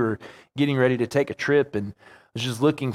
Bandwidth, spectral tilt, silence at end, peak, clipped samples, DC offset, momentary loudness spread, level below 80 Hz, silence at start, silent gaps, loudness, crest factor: 15 kHz; -6 dB/octave; 0 s; -6 dBFS; under 0.1%; under 0.1%; 15 LU; -62 dBFS; 0 s; none; -24 LUFS; 18 dB